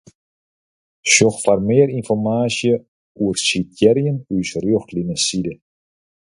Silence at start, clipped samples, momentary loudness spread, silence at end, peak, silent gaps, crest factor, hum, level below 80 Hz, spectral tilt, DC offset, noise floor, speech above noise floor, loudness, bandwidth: 1.05 s; under 0.1%; 10 LU; 0.75 s; 0 dBFS; 2.88-3.15 s; 18 dB; none; -52 dBFS; -4 dB/octave; under 0.1%; under -90 dBFS; over 73 dB; -18 LUFS; 11.5 kHz